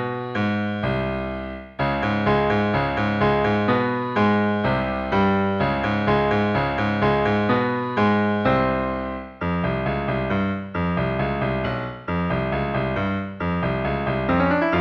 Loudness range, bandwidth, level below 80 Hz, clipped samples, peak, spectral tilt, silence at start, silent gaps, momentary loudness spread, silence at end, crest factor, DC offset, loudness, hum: 4 LU; 7 kHz; -40 dBFS; under 0.1%; -6 dBFS; -8.5 dB/octave; 0 s; none; 7 LU; 0 s; 14 dB; under 0.1%; -22 LUFS; none